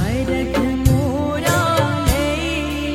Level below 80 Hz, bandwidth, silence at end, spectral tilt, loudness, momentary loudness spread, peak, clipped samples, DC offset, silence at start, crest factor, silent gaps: -28 dBFS; 16.5 kHz; 0 s; -5.5 dB/octave; -18 LUFS; 4 LU; -2 dBFS; under 0.1%; under 0.1%; 0 s; 16 dB; none